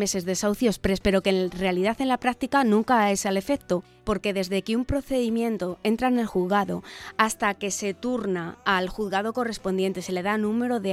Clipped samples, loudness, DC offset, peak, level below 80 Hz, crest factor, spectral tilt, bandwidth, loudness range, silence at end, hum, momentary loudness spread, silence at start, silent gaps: under 0.1%; -25 LUFS; under 0.1%; -4 dBFS; -46 dBFS; 20 dB; -4.5 dB/octave; 15.5 kHz; 3 LU; 0 s; none; 7 LU; 0 s; none